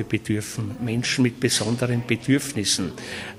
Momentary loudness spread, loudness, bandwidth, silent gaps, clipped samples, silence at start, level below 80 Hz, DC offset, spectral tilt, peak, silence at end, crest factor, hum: 8 LU; -23 LUFS; 15.5 kHz; none; under 0.1%; 0 s; -54 dBFS; under 0.1%; -4 dB/octave; -6 dBFS; 0 s; 18 dB; none